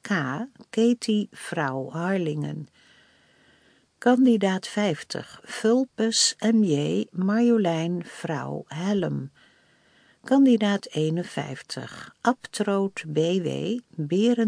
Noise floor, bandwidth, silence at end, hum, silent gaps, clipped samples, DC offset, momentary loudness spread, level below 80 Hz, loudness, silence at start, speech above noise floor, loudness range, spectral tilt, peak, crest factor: -61 dBFS; 10.5 kHz; 0 s; none; none; under 0.1%; under 0.1%; 14 LU; -72 dBFS; -25 LUFS; 0.05 s; 37 dB; 4 LU; -5 dB/octave; -6 dBFS; 18 dB